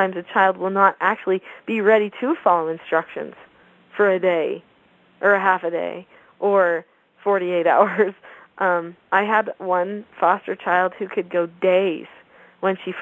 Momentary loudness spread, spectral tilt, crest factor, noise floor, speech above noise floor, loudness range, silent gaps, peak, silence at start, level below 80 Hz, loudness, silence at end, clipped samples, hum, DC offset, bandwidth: 10 LU; -7.5 dB/octave; 20 dB; -56 dBFS; 36 dB; 2 LU; none; 0 dBFS; 0 s; -76 dBFS; -20 LUFS; 0 s; under 0.1%; none; under 0.1%; 7.6 kHz